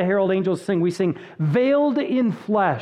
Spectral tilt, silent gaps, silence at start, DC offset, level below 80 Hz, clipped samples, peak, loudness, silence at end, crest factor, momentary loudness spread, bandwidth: -8 dB/octave; none; 0 s; under 0.1%; -68 dBFS; under 0.1%; -8 dBFS; -21 LUFS; 0 s; 14 dB; 5 LU; 11.5 kHz